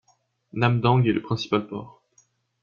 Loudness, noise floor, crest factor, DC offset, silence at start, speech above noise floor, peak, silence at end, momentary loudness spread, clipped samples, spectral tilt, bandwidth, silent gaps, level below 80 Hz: -23 LUFS; -66 dBFS; 20 dB; under 0.1%; 0.55 s; 43 dB; -6 dBFS; 0.75 s; 17 LU; under 0.1%; -7.5 dB/octave; 7 kHz; none; -58 dBFS